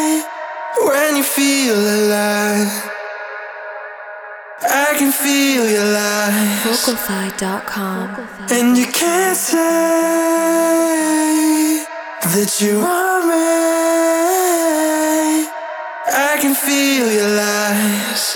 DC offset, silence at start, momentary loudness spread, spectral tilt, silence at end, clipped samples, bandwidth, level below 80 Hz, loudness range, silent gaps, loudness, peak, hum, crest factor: under 0.1%; 0 s; 13 LU; -3 dB/octave; 0 s; under 0.1%; over 20 kHz; -62 dBFS; 3 LU; none; -15 LUFS; -2 dBFS; none; 14 dB